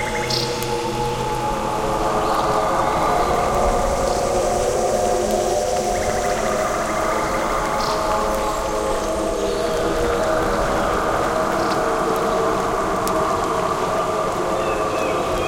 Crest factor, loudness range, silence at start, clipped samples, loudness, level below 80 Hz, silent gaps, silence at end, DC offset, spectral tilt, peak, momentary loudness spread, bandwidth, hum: 18 dB; 2 LU; 0 s; under 0.1%; -20 LUFS; -34 dBFS; none; 0 s; under 0.1%; -4 dB/octave; -2 dBFS; 3 LU; 17 kHz; none